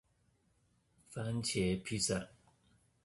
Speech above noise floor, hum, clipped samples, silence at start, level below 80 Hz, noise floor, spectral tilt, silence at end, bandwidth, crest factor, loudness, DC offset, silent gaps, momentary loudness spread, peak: 38 dB; 60 Hz at -60 dBFS; under 0.1%; 1.1 s; -60 dBFS; -75 dBFS; -4 dB/octave; 0.8 s; 11.5 kHz; 18 dB; -37 LUFS; under 0.1%; none; 13 LU; -22 dBFS